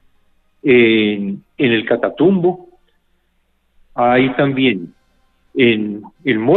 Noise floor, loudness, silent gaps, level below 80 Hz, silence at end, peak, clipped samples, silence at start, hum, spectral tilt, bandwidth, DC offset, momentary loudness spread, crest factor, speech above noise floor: -62 dBFS; -15 LUFS; none; -56 dBFS; 0 s; -2 dBFS; under 0.1%; 0.65 s; none; -9.5 dB/octave; 4.2 kHz; under 0.1%; 14 LU; 16 dB; 47 dB